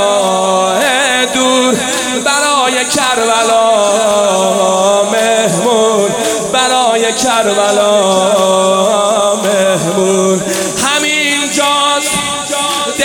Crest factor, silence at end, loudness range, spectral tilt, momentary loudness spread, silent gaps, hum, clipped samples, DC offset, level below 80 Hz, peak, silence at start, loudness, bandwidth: 10 dB; 0 s; 1 LU; -2.5 dB/octave; 3 LU; none; none; under 0.1%; under 0.1%; -50 dBFS; 0 dBFS; 0 s; -10 LUFS; 18 kHz